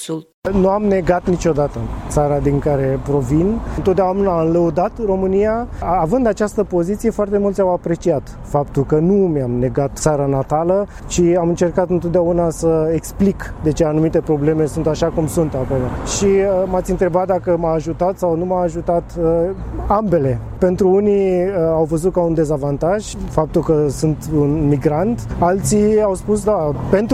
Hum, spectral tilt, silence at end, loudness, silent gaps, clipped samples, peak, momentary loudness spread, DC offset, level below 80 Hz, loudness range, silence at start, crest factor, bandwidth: none; -7 dB/octave; 0 s; -17 LUFS; 0.34-0.42 s; under 0.1%; 0 dBFS; 5 LU; under 0.1%; -32 dBFS; 1 LU; 0 s; 16 dB; 15 kHz